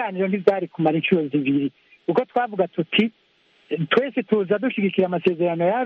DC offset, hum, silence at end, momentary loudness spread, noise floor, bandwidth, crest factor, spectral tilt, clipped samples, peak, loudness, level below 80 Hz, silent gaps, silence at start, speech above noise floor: under 0.1%; none; 0 s; 4 LU; -59 dBFS; 5.8 kHz; 20 dB; -8.5 dB/octave; under 0.1%; -2 dBFS; -22 LUFS; -68 dBFS; none; 0 s; 38 dB